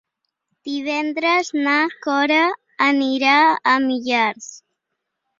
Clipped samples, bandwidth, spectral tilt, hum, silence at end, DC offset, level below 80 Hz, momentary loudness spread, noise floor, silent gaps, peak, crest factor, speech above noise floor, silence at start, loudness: under 0.1%; 7.6 kHz; -2.5 dB/octave; none; 0.85 s; under 0.1%; -70 dBFS; 12 LU; -78 dBFS; none; -2 dBFS; 18 dB; 60 dB; 0.65 s; -18 LUFS